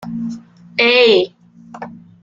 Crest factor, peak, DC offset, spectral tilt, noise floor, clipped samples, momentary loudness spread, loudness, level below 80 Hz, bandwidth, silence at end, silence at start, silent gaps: 16 dB; -2 dBFS; under 0.1%; -4.5 dB/octave; -35 dBFS; under 0.1%; 24 LU; -14 LUFS; -60 dBFS; 7.4 kHz; 0.3 s; 0 s; none